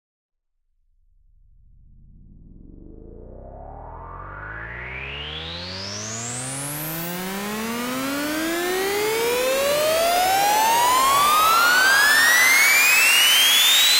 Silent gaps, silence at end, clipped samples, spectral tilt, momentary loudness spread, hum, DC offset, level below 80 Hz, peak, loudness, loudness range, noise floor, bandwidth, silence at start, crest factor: none; 0 s; under 0.1%; -1 dB/octave; 19 LU; none; under 0.1%; -48 dBFS; -4 dBFS; -17 LUFS; 20 LU; -69 dBFS; 16 kHz; 2.7 s; 18 dB